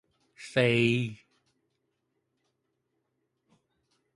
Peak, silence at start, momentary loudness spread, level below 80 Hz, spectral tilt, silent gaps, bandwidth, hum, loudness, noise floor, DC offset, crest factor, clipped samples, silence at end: -10 dBFS; 0.4 s; 15 LU; -70 dBFS; -6 dB/octave; none; 11.5 kHz; none; -27 LUFS; -79 dBFS; under 0.1%; 24 dB; under 0.1%; 3 s